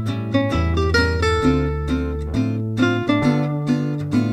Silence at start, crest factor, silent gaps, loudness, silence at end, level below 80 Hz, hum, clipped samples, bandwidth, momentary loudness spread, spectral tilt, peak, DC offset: 0 s; 14 dB; none; -20 LUFS; 0 s; -30 dBFS; none; under 0.1%; 12 kHz; 5 LU; -7 dB/octave; -4 dBFS; under 0.1%